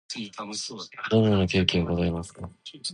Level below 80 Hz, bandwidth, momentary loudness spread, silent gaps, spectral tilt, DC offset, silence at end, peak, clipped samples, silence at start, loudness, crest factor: -44 dBFS; 11 kHz; 16 LU; none; -5.5 dB/octave; under 0.1%; 0 s; -4 dBFS; under 0.1%; 0.1 s; -26 LUFS; 22 dB